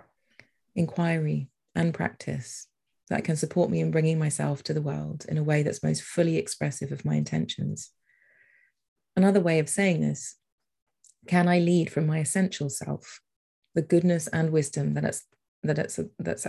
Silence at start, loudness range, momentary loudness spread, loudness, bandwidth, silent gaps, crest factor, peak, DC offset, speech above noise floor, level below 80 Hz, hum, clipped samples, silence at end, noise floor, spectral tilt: 0.75 s; 4 LU; 11 LU; -27 LUFS; 12.5 kHz; 8.88-8.96 s, 10.52-10.58 s, 10.82-10.86 s, 13.36-13.62 s, 15.48-15.62 s; 18 dB; -8 dBFS; under 0.1%; 37 dB; -62 dBFS; none; under 0.1%; 0 s; -64 dBFS; -6 dB/octave